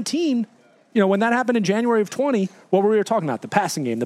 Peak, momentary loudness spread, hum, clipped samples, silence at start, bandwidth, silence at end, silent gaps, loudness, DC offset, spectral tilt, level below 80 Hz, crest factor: -2 dBFS; 6 LU; none; under 0.1%; 0 s; 14.5 kHz; 0 s; none; -21 LUFS; under 0.1%; -5.5 dB/octave; -76 dBFS; 20 dB